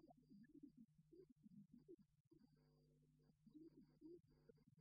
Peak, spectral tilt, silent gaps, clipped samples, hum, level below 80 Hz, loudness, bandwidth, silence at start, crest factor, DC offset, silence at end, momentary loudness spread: -54 dBFS; -8.5 dB/octave; 1.32-1.36 s, 2.20-2.31 s; under 0.1%; none; -90 dBFS; -68 LUFS; 4.9 kHz; 0 s; 16 dB; under 0.1%; 0 s; 3 LU